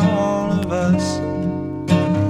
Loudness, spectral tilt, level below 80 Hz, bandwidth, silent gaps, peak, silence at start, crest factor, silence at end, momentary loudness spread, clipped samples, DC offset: -20 LUFS; -7 dB/octave; -44 dBFS; 11.5 kHz; none; -2 dBFS; 0 s; 16 dB; 0 s; 6 LU; under 0.1%; under 0.1%